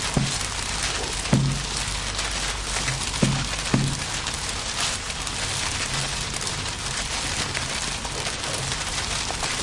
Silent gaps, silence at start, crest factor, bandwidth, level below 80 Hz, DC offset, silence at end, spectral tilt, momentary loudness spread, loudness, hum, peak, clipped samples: none; 0 s; 18 dB; 11.5 kHz; -36 dBFS; under 0.1%; 0 s; -2.5 dB/octave; 4 LU; -25 LUFS; none; -8 dBFS; under 0.1%